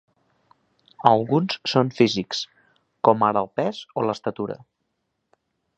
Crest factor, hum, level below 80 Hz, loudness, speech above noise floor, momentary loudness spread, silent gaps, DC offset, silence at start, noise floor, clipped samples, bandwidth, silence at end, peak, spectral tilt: 24 dB; none; -64 dBFS; -22 LUFS; 54 dB; 12 LU; none; under 0.1%; 1 s; -76 dBFS; under 0.1%; 8.4 kHz; 1.2 s; 0 dBFS; -6 dB/octave